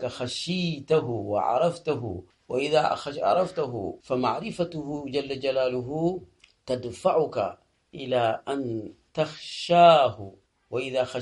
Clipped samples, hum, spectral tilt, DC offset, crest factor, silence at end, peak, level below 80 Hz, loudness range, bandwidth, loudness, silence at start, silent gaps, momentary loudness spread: under 0.1%; none; -5.5 dB/octave; under 0.1%; 22 dB; 0 s; -4 dBFS; -62 dBFS; 5 LU; 11.5 kHz; -26 LUFS; 0 s; none; 10 LU